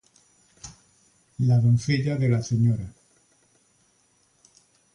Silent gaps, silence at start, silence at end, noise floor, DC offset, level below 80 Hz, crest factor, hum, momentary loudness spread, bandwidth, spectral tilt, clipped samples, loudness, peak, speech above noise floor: none; 0.65 s; 2.05 s; -65 dBFS; under 0.1%; -54 dBFS; 16 dB; none; 24 LU; 10.5 kHz; -7 dB/octave; under 0.1%; -23 LUFS; -10 dBFS; 43 dB